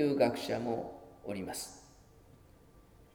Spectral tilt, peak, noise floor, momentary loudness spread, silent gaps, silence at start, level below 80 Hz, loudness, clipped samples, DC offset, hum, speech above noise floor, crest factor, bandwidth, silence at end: -5 dB/octave; -16 dBFS; -60 dBFS; 17 LU; none; 0 s; -64 dBFS; -36 LUFS; under 0.1%; under 0.1%; none; 26 dB; 22 dB; 19.5 kHz; 0.35 s